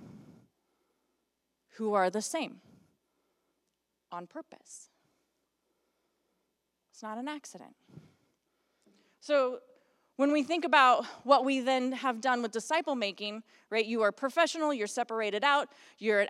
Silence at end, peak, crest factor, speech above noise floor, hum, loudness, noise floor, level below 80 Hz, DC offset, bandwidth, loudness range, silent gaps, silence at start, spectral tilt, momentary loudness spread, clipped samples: 0 s; -10 dBFS; 24 dB; 52 dB; none; -30 LUFS; -82 dBFS; -90 dBFS; under 0.1%; 14.5 kHz; 23 LU; none; 0 s; -3 dB/octave; 21 LU; under 0.1%